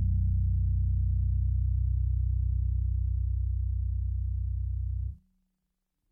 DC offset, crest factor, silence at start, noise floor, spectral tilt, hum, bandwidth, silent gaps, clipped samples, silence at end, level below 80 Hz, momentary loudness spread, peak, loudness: under 0.1%; 8 dB; 0 s; -81 dBFS; -13 dB/octave; none; 0.3 kHz; none; under 0.1%; 0.95 s; -30 dBFS; 5 LU; -20 dBFS; -31 LUFS